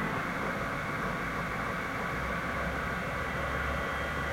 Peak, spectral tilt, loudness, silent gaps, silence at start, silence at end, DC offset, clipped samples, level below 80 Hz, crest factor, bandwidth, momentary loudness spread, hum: -20 dBFS; -5.5 dB/octave; -33 LUFS; none; 0 s; 0 s; under 0.1%; under 0.1%; -44 dBFS; 12 dB; 16 kHz; 1 LU; none